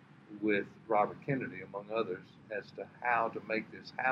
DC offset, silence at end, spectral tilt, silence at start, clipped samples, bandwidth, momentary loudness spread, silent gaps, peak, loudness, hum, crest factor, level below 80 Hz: under 0.1%; 0 s; -7.5 dB/octave; 0.15 s; under 0.1%; 7 kHz; 12 LU; none; -14 dBFS; -36 LUFS; none; 22 dB; -80 dBFS